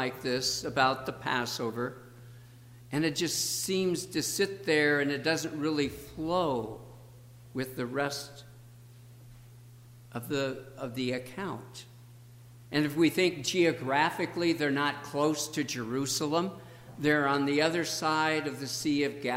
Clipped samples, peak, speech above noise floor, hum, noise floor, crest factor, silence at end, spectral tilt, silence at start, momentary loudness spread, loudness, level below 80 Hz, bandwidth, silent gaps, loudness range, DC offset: under 0.1%; -10 dBFS; 22 dB; none; -52 dBFS; 20 dB; 0 s; -4 dB/octave; 0 s; 13 LU; -30 LUFS; -64 dBFS; 16 kHz; none; 9 LU; under 0.1%